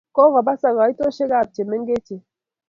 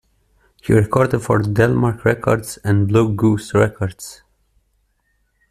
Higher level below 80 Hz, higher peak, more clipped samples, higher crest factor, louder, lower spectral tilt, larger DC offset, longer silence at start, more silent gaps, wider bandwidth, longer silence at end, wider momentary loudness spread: second, -60 dBFS vs -46 dBFS; about the same, -2 dBFS vs -2 dBFS; neither; about the same, 16 dB vs 16 dB; about the same, -19 LUFS vs -17 LUFS; about the same, -7 dB/octave vs -7 dB/octave; neither; second, 0.15 s vs 0.65 s; neither; second, 7 kHz vs 14 kHz; second, 0.5 s vs 1.35 s; about the same, 10 LU vs 11 LU